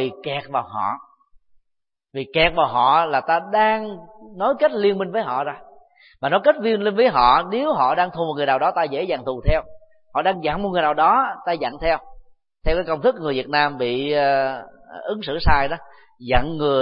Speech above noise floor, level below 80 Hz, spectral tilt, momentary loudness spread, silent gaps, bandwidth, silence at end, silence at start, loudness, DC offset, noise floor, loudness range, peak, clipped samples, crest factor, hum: 58 dB; -36 dBFS; -10 dB/octave; 12 LU; none; 5.4 kHz; 0 s; 0 s; -20 LUFS; under 0.1%; -77 dBFS; 3 LU; -2 dBFS; under 0.1%; 20 dB; none